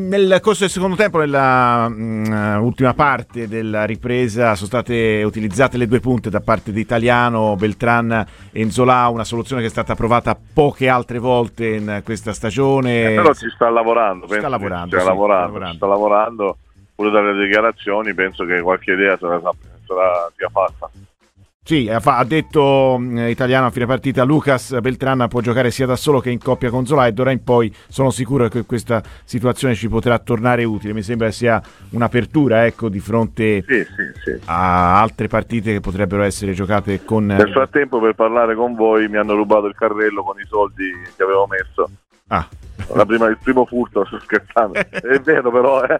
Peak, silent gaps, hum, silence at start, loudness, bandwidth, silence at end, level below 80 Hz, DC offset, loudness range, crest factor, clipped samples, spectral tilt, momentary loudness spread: 0 dBFS; 21.54-21.60 s; none; 0 s; -17 LUFS; 15 kHz; 0 s; -42 dBFS; under 0.1%; 2 LU; 16 dB; under 0.1%; -6.5 dB/octave; 8 LU